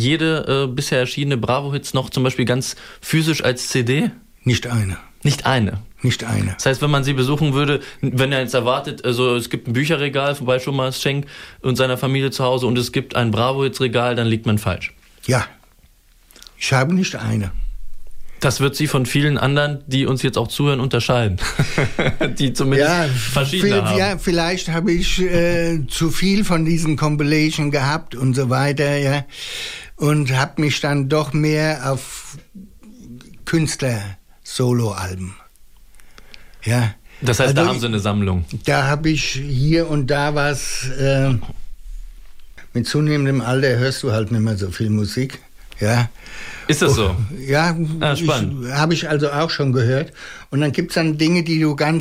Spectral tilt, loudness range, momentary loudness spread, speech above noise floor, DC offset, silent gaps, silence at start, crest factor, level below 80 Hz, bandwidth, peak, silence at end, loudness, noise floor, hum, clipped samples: -5.5 dB/octave; 4 LU; 8 LU; 33 dB; under 0.1%; none; 0 s; 14 dB; -36 dBFS; 16 kHz; -4 dBFS; 0 s; -19 LUFS; -51 dBFS; none; under 0.1%